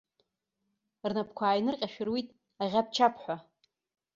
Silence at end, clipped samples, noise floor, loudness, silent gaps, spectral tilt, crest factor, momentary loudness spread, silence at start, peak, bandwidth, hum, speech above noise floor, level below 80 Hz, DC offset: 0.75 s; under 0.1%; -83 dBFS; -31 LUFS; none; -5 dB/octave; 22 dB; 12 LU; 1.05 s; -10 dBFS; 7.8 kHz; none; 52 dB; -74 dBFS; under 0.1%